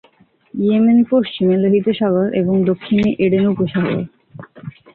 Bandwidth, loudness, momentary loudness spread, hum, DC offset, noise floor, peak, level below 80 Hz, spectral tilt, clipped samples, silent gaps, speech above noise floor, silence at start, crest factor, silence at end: 4.4 kHz; -16 LUFS; 17 LU; none; under 0.1%; -53 dBFS; -4 dBFS; -52 dBFS; -10 dB/octave; under 0.1%; none; 38 dB; 0.55 s; 12 dB; 0.25 s